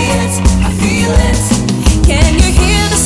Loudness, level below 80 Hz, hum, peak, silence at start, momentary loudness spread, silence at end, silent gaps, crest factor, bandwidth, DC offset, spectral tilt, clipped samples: -11 LUFS; -14 dBFS; none; 0 dBFS; 0 s; 3 LU; 0 s; none; 10 dB; 12 kHz; under 0.1%; -4.5 dB/octave; under 0.1%